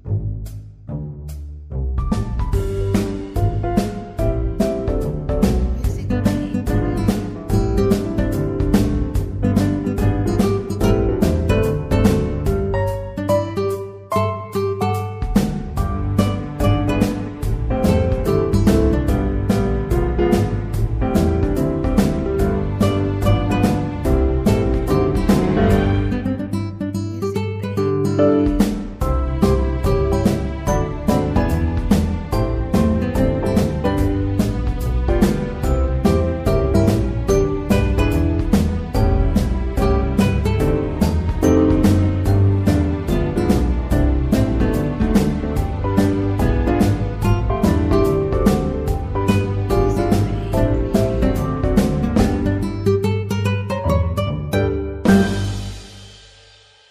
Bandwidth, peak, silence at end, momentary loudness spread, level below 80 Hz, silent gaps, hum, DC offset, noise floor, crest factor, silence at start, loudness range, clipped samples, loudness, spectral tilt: 15.5 kHz; -2 dBFS; 0.75 s; 6 LU; -24 dBFS; none; none; under 0.1%; -48 dBFS; 16 dB; 0.05 s; 3 LU; under 0.1%; -19 LUFS; -7.5 dB/octave